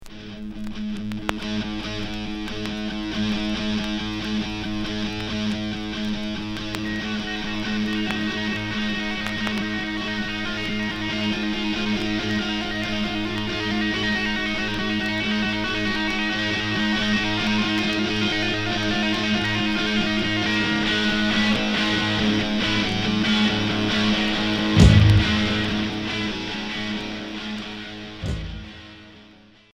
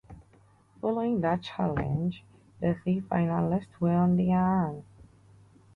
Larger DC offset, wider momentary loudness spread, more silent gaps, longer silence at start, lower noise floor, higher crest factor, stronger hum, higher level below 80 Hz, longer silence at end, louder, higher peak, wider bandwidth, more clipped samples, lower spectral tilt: neither; about the same, 9 LU vs 10 LU; neither; about the same, 0 s vs 0.1 s; second, -50 dBFS vs -60 dBFS; first, 22 dB vs 14 dB; neither; first, -36 dBFS vs -54 dBFS; second, 0.4 s vs 0.75 s; first, -23 LUFS vs -28 LUFS; first, 0 dBFS vs -14 dBFS; first, 12.5 kHz vs 4.9 kHz; neither; second, -5 dB/octave vs -9.5 dB/octave